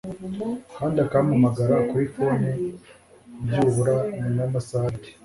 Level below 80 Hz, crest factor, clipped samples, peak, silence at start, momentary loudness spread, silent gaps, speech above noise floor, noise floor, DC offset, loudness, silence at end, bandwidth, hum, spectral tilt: -52 dBFS; 16 dB; under 0.1%; -6 dBFS; 0.05 s; 11 LU; none; 25 dB; -48 dBFS; under 0.1%; -24 LUFS; 0.15 s; 11.5 kHz; none; -8 dB/octave